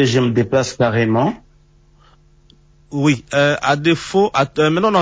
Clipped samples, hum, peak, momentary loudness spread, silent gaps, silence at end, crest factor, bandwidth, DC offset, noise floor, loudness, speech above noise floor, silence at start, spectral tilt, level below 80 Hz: under 0.1%; none; -2 dBFS; 3 LU; none; 0 s; 14 dB; 8 kHz; under 0.1%; -51 dBFS; -16 LUFS; 35 dB; 0 s; -5.5 dB/octave; -48 dBFS